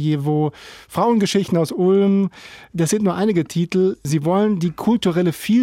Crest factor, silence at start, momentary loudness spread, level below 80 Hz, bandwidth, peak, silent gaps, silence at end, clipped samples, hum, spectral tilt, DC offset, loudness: 12 dB; 0 s; 6 LU; -56 dBFS; 16.5 kHz; -6 dBFS; none; 0 s; under 0.1%; none; -6.5 dB/octave; under 0.1%; -19 LUFS